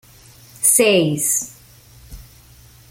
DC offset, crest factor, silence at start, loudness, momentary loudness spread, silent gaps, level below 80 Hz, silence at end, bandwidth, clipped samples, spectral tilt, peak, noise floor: under 0.1%; 18 dB; 0.6 s; -15 LUFS; 8 LU; none; -48 dBFS; 0.7 s; 17 kHz; under 0.1%; -2.5 dB/octave; -2 dBFS; -46 dBFS